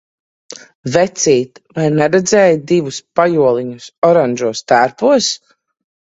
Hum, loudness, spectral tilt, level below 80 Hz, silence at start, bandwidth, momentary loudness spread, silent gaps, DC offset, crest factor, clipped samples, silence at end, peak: none; -13 LUFS; -4.5 dB/octave; -56 dBFS; 0.85 s; 8 kHz; 14 LU; 3.98-4.02 s; under 0.1%; 14 dB; under 0.1%; 0.8 s; 0 dBFS